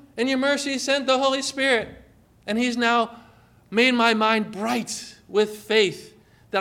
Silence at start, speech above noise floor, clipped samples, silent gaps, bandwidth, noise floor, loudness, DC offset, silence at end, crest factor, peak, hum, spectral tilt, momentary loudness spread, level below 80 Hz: 0.15 s; 31 dB; under 0.1%; none; 16 kHz; -53 dBFS; -22 LUFS; under 0.1%; 0 s; 18 dB; -6 dBFS; none; -3 dB/octave; 11 LU; -62 dBFS